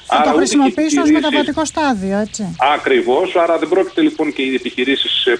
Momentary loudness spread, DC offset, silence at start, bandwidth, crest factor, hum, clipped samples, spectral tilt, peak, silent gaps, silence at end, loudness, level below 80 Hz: 6 LU; under 0.1%; 0.05 s; 10.5 kHz; 12 dB; none; under 0.1%; -3.5 dB/octave; -2 dBFS; none; 0 s; -15 LUFS; -50 dBFS